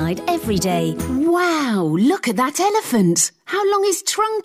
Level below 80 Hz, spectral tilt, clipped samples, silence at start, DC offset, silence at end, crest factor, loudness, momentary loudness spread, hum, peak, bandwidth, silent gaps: -48 dBFS; -4 dB/octave; under 0.1%; 0 s; under 0.1%; 0.05 s; 12 dB; -18 LUFS; 4 LU; none; -6 dBFS; 16 kHz; none